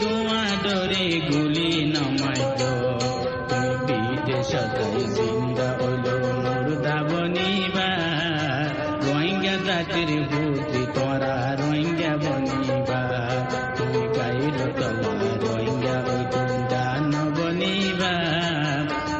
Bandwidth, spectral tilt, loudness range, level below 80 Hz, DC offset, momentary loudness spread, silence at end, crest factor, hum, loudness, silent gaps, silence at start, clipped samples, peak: 8.4 kHz; -5.5 dB/octave; 1 LU; -50 dBFS; under 0.1%; 3 LU; 0 s; 14 dB; none; -24 LUFS; none; 0 s; under 0.1%; -10 dBFS